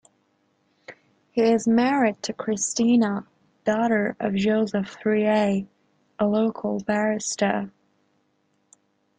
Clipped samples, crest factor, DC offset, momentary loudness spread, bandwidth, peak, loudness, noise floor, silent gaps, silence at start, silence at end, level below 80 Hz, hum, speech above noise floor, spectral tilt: under 0.1%; 18 dB; under 0.1%; 9 LU; 9.4 kHz; -6 dBFS; -23 LUFS; -69 dBFS; none; 0.9 s; 1.5 s; -64 dBFS; none; 47 dB; -5 dB/octave